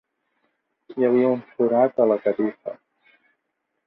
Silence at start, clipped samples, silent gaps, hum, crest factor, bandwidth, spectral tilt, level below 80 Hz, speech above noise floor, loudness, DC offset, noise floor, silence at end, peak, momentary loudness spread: 0.9 s; under 0.1%; none; none; 18 dB; 4.3 kHz; -11 dB/octave; -72 dBFS; 57 dB; -21 LUFS; under 0.1%; -77 dBFS; 1.15 s; -6 dBFS; 17 LU